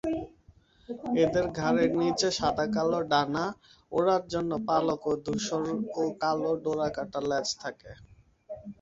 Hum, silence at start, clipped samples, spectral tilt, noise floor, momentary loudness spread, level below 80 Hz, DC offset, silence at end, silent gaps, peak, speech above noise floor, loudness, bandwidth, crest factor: none; 0.05 s; under 0.1%; -5 dB/octave; -59 dBFS; 14 LU; -58 dBFS; under 0.1%; 0.1 s; none; -10 dBFS; 31 dB; -29 LUFS; 8 kHz; 18 dB